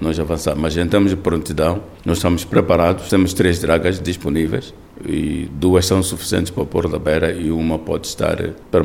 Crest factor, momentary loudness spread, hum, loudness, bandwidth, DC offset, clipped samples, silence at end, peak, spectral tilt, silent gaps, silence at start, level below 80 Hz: 16 dB; 7 LU; none; -18 LUFS; 19 kHz; 0.2%; under 0.1%; 0 s; -2 dBFS; -5.5 dB/octave; none; 0 s; -34 dBFS